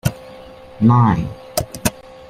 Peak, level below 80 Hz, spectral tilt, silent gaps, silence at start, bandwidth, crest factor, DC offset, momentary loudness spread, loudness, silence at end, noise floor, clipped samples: 0 dBFS; -40 dBFS; -6 dB/octave; none; 0.05 s; 16 kHz; 18 dB; under 0.1%; 16 LU; -18 LUFS; 0.4 s; -38 dBFS; under 0.1%